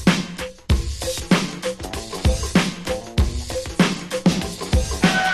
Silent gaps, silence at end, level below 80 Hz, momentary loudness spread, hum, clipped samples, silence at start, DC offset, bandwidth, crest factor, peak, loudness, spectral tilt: none; 0 s; -28 dBFS; 9 LU; none; under 0.1%; 0 s; under 0.1%; 13 kHz; 18 dB; -4 dBFS; -22 LUFS; -5 dB/octave